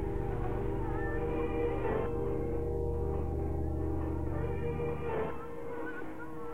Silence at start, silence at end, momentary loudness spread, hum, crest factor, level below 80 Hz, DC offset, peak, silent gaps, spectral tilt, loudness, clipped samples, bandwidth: 0 s; 0 s; 7 LU; none; 12 dB; -42 dBFS; 0.9%; -20 dBFS; none; -9.5 dB/octave; -36 LUFS; under 0.1%; 14 kHz